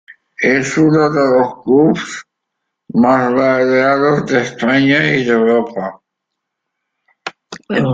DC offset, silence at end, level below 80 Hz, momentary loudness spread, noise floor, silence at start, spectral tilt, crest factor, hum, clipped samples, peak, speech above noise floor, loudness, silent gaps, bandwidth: under 0.1%; 0 s; -54 dBFS; 15 LU; -77 dBFS; 0.1 s; -6 dB/octave; 14 dB; none; under 0.1%; -2 dBFS; 64 dB; -13 LUFS; none; 9 kHz